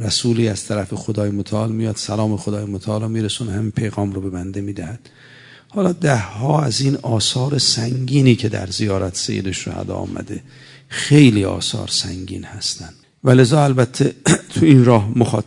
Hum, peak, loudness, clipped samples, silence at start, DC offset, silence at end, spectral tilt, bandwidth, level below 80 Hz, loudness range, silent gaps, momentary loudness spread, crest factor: none; 0 dBFS; -18 LUFS; under 0.1%; 0 s; under 0.1%; 0.05 s; -5.5 dB/octave; 11 kHz; -52 dBFS; 7 LU; none; 14 LU; 18 dB